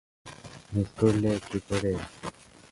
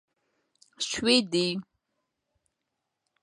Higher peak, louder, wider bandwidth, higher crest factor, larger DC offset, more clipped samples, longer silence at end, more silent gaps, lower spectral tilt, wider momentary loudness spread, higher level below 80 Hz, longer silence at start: about the same, -8 dBFS vs -8 dBFS; second, -29 LUFS vs -26 LUFS; about the same, 11.5 kHz vs 11.5 kHz; about the same, 20 dB vs 24 dB; neither; neither; second, 0.4 s vs 1.6 s; neither; first, -6.5 dB/octave vs -3.5 dB/octave; first, 21 LU vs 12 LU; first, -50 dBFS vs -66 dBFS; second, 0.25 s vs 0.8 s